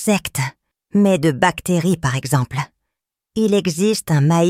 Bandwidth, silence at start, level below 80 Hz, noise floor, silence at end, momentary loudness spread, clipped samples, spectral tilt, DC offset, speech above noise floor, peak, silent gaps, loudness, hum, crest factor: 16 kHz; 0 s; -48 dBFS; -81 dBFS; 0 s; 10 LU; under 0.1%; -5.5 dB/octave; under 0.1%; 64 dB; 0 dBFS; none; -18 LUFS; none; 18 dB